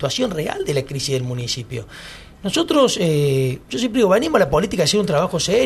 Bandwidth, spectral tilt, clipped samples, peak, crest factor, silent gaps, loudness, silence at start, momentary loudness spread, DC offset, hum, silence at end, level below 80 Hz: 13 kHz; -4.5 dB/octave; under 0.1%; 0 dBFS; 18 dB; none; -19 LUFS; 0 s; 13 LU; under 0.1%; none; 0 s; -44 dBFS